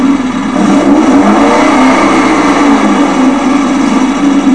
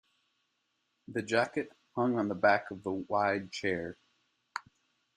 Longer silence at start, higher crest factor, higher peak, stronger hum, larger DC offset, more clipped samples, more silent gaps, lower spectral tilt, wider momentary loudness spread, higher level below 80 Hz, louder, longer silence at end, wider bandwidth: second, 0 s vs 1.1 s; second, 6 dB vs 22 dB; first, 0 dBFS vs -12 dBFS; neither; first, 2% vs under 0.1%; first, 2% vs under 0.1%; neither; about the same, -5 dB/octave vs -5.5 dB/octave; second, 3 LU vs 16 LU; first, -36 dBFS vs -74 dBFS; first, -7 LUFS vs -32 LUFS; second, 0 s vs 0.55 s; about the same, 11 kHz vs 10.5 kHz